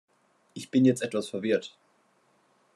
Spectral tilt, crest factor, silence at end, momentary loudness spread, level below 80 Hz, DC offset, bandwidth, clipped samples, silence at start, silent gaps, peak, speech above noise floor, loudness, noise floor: -6 dB/octave; 20 dB; 1.05 s; 22 LU; -76 dBFS; under 0.1%; 12 kHz; under 0.1%; 0.55 s; none; -10 dBFS; 41 dB; -27 LUFS; -67 dBFS